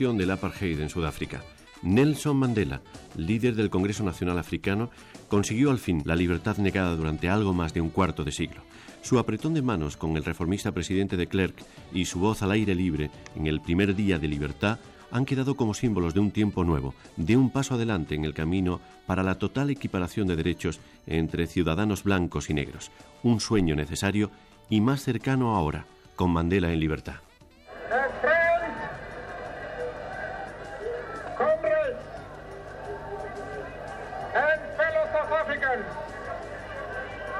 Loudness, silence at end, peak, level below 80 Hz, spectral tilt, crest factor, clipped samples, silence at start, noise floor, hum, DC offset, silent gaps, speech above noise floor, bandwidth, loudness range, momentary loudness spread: -27 LUFS; 0 s; -12 dBFS; -44 dBFS; -6 dB/octave; 16 dB; under 0.1%; 0 s; -50 dBFS; none; under 0.1%; none; 24 dB; 14.5 kHz; 4 LU; 13 LU